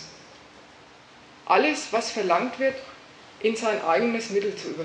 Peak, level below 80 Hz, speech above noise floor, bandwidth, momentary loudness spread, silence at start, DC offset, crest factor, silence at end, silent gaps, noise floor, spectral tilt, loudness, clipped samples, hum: -6 dBFS; -70 dBFS; 26 dB; 10.5 kHz; 20 LU; 0 s; under 0.1%; 22 dB; 0 s; none; -50 dBFS; -3.5 dB/octave; -25 LUFS; under 0.1%; none